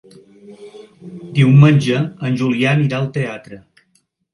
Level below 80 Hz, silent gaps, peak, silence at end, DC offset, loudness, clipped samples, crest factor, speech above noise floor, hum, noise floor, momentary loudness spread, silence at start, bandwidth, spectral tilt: -54 dBFS; none; 0 dBFS; 0.75 s; under 0.1%; -15 LUFS; under 0.1%; 16 dB; 48 dB; none; -62 dBFS; 19 LU; 0.5 s; 11 kHz; -7.5 dB/octave